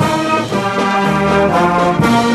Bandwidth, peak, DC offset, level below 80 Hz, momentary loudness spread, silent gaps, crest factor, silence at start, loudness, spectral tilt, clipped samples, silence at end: 14.5 kHz; 0 dBFS; under 0.1%; -38 dBFS; 3 LU; none; 12 dB; 0 s; -13 LUFS; -5.5 dB/octave; under 0.1%; 0 s